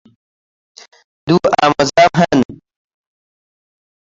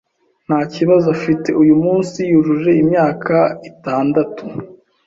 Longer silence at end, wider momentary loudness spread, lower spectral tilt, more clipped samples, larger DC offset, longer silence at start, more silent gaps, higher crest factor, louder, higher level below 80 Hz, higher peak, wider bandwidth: first, 1.6 s vs 0.35 s; about the same, 9 LU vs 11 LU; second, -5.5 dB/octave vs -8 dB/octave; neither; neither; first, 1.25 s vs 0.5 s; first, 2.45-2.49 s vs none; about the same, 16 dB vs 14 dB; about the same, -13 LUFS vs -15 LUFS; first, -48 dBFS vs -54 dBFS; about the same, 0 dBFS vs -2 dBFS; about the same, 7.8 kHz vs 7.8 kHz